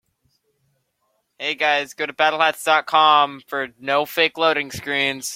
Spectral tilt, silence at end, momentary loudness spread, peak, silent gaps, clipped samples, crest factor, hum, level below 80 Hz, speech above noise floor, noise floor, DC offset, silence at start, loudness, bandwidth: -2 dB/octave; 0 s; 12 LU; -2 dBFS; none; under 0.1%; 20 dB; none; -66 dBFS; 51 dB; -70 dBFS; under 0.1%; 1.4 s; -19 LUFS; 16.5 kHz